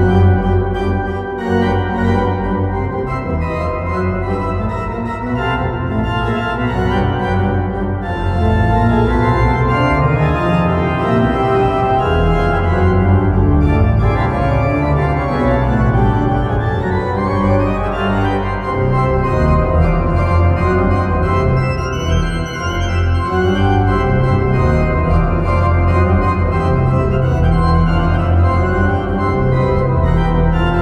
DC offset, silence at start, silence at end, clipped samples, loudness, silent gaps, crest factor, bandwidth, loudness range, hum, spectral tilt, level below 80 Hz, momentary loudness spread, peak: under 0.1%; 0 s; 0 s; under 0.1%; -15 LUFS; none; 14 dB; 8.8 kHz; 4 LU; none; -8.5 dB/octave; -22 dBFS; 5 LU; 0 dBFS